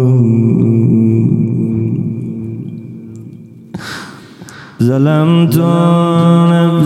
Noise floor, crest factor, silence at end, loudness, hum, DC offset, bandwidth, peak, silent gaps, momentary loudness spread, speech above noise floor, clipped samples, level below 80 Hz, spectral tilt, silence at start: -33 dBFS; 12 dB; 0 s; -11 LUFS; none; under 0.1%; 15 kHz; 0 dBFS; none; 20 LU; 24 dB; under 0.1%; -50 dBFS; -8.5 dB/octave; 0 s